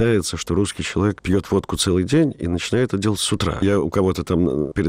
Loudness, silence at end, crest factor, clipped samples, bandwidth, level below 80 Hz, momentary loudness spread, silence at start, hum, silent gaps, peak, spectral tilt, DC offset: -20 LUFS; 0 s; 12 dB; under 0.1%; 16 kHz; -40 dBFS; 3 LU; 0 s; none; none; -6 dBFS; -5.5 dB/octave; 0.2%